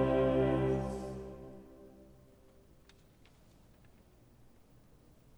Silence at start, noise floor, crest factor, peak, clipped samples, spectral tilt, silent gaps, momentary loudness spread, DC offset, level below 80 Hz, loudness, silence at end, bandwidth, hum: 0 s; -62 dBFS; 18 dB; -18 dBFS; under 0.1%; -8.5 dB/octave; none; 27 LU; under 0.1%; -52 dBFS; -33 LUFS; 3.35 s; over 20 kHz; none